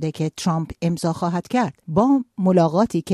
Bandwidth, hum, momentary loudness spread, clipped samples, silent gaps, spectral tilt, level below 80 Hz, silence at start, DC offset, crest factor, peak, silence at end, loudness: 13 kHz; none; 7 LU; under 0.1%; none; -7 dB/octave; -52 dBFS; 0 s; under 0.1%; 16 dB; -4 dBFS; 0 s; -21 LUFS